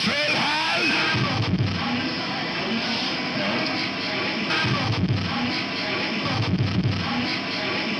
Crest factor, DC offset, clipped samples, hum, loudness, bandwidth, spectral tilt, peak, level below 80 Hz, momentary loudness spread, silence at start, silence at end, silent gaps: 14 dB; under 0.1%; under 0.1%; none; -23 LUFS; 11.5 kHz; -5 dB/octave; -10 dBFS; -50 dBFS; 4 LU; 0 s; 0 s; none